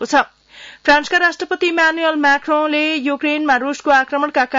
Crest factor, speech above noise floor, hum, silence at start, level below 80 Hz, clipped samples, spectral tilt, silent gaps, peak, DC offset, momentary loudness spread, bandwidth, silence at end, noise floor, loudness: 14 dB; 25 dB; none; 0 s; -52 dBFS; under 0.1%; -2 dB/octave; none; -2 dBFS; under 0.1%; 4 LU; 7.8 kHz; 0 s; -41 dBFS; -15 LUFS